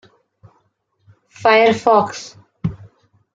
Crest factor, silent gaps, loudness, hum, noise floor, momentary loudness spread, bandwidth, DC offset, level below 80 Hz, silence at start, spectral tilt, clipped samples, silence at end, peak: 20 dB; none; -16 LUFS; none; -65 dBFS; 17 LU; 7.8 kHz; under 0.1%; -54 dBFS; 1.4 s; -5 dB/octave; under 0.1%; 0.6 s; 0 dBFS